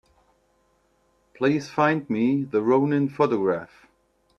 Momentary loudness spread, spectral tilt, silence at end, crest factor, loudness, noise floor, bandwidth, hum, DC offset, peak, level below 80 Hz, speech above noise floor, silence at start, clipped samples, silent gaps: 5 LU; -7.5 dB/octave; 0.75 s; 18 dB; -23 LUFS; -66 dBFS; 7.6 kHz; none; under 0.1%; -6 dBFS; -66 dBFS; 43 dB; 1.4 s; under 0.1%; none